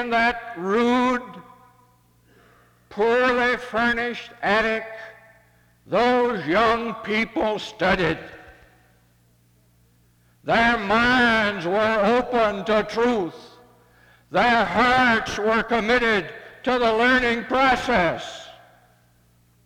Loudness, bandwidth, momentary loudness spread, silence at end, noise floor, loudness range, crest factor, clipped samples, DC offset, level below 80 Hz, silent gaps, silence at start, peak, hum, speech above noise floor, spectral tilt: -21 LUFS; 15.5 kHz; 11 LU; 1.15 s; -59 dBFS; 5 LU; 16 dB; under 0.1%; under 0.1%; -48 dBFS; none; 0 s; -8 dBFS; 60 Hz at -60 dBFS; 39 dB; -5 dB/octave